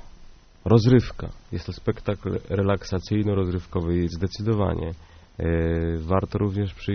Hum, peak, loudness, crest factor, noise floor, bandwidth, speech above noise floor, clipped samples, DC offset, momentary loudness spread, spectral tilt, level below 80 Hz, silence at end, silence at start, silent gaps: none; -4 dBFS; -25 LUFS; 20 dB; -47 dBFS; 6.6 kHz; 23 dB; under 0.1%; under 0.1%; 14 LU; -7.5 dB/octave; -38 dBFS; 0 s; 0.05 s; none